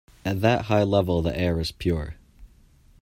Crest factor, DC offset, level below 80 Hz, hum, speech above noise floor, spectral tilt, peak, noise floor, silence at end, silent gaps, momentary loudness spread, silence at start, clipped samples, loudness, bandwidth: 20 dB; under 0.1%; -42 dBFS; none; 32 dB; -7 dB/octave; -6 dBFS; -55 dBFS; 0.55 s; none; 9 LU; 0.25 s; under 0.1%; -24 LUFS; 16 kHz